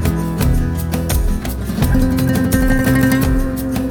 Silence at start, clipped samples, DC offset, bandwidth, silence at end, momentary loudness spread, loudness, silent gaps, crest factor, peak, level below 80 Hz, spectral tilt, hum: 0 s; under 0.1%; under 0.1%; over 20 kHz; 0 s; 6 LU; -17 LUFS; none; 14 dB; -2 dBFS; -20 dBFS; -6 dB/octave; none